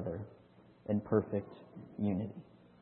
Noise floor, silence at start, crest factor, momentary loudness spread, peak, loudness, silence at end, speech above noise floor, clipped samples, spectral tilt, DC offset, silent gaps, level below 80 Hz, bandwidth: -61 dBFS; 0 s; 22 dB; 19 LU; -16 dBFS; -37 LUFS; 0.4 s; 26 dB; under 0.1%; -9.5 dB/octave; under 0.1%; none; -70 dBFS; 4.2 kHz